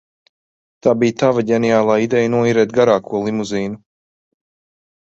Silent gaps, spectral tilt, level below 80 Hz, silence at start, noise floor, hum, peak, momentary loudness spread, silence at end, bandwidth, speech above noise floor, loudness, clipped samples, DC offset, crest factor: none; -6 dB/octave; -56 dBFS; 0.85 s; under -90 dBFS; none; -2 dBFS; 8 LU; 1.35 s; 8 kHz; over 75 dB; -16 LUFS; under 0.1%; under 0.1%; 16 dB